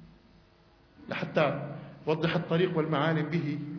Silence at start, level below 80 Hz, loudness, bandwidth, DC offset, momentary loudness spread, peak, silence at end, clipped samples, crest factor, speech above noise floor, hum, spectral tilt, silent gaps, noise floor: 0 s; -64 dBFS; -30 LUFS; 5.4 kHz; under 0.1%; 10 LU; -12 dBFS; 0 s; under 0.1%; 18 dB; 32 dB; none; -8 dB/octave; none; -60 dBFS